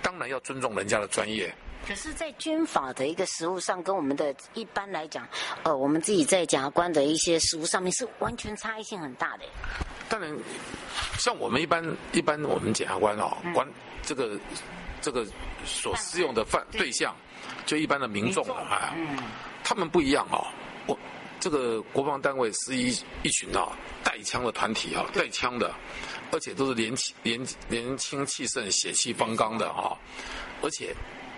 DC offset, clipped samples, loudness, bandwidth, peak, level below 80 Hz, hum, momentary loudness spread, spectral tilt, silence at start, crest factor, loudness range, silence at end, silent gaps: under 0.1%; under 0.1%; -29 LUFS; 11.5 kHz; -8 dBFS; -50 dBFS; none; 12 LU; -3 dB/octave; 0 s; 22 dB; 5 LU; 0 s; none